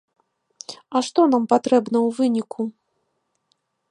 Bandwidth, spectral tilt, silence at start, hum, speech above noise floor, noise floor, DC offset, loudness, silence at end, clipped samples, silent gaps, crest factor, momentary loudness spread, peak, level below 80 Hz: 10.5 kHz; -5 dB/octave; 0.7 s; none; 54 dB; -73 dBFS; under 0.1%; -20 LUFS; 1.2 s; under 0.1%; none; 20 dB; 17 LU; -2 dBFS; -76 dBFS